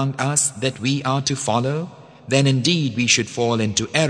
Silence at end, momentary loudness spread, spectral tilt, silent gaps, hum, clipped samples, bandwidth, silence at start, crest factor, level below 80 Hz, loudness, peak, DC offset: 0 s; 6 LU; -4 dB/octave; none; none; under 0.1%; 10 kHz; 0 s; 20 dB; -58 dBFS; -19 LUFS; 0 dBFS; under 0.1%